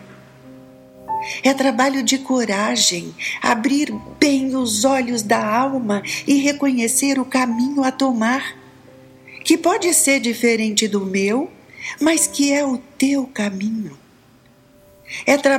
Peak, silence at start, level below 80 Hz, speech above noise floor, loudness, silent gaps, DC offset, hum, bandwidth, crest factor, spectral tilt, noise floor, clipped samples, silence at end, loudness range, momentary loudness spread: -2 dBFS; 0 s; -60 dBFS; 33 dB; -18 LUFS; none; under 0.1%; none; 16.5 kHz; 18 dB; -2.5 dB/octave; -51 dBFS; under 0.1%; 0 s; 3 LU; 9 LU